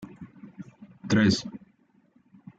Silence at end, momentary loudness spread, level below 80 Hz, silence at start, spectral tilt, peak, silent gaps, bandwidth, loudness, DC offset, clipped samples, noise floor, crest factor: 1 s; 25 LU; -62 dBFS; 0 s; -5.5 dB/octave; -12 dBFS; none; 9 kHz; -24 LUFS; under 0.1%; under 0.1%; -64 dBFS; 18 dB